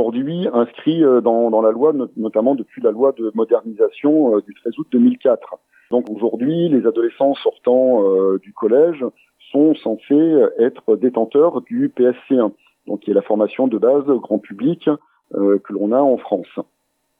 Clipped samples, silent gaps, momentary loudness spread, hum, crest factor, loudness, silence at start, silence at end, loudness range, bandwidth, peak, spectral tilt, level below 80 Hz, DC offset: under 0.1%; none; 8 LU; none; 14 dB; -17 LUFS; 0 s; 0.55 s; 2 LU; 3.9 kHz; -2 dBFS; -10 dB/octave; -78 dBFS; under 0.1%